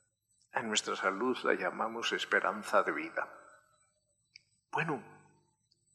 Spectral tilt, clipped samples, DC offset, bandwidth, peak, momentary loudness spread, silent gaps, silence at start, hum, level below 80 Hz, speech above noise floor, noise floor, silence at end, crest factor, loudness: -3 dB/octave; under 0.1%; under 0.1%; 13.5 kHz; -14 dBFS; 9 LU; none; 0.55 s; 50 Hz at -70 dBFS; -86 dBFS; 43 dB; -77 dBFS; 0.75 s; 24 dB; -33 LUFS